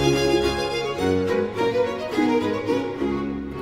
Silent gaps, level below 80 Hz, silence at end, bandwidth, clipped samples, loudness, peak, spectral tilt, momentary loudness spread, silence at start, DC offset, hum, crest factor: none; -42 dBFS; 0 s; 16 kHz; under 0.1%; -23 LUFS; -6 dBFS; -5.5 dB/octave; 5 LU; 0 s; under 0.1%; none; 16 dB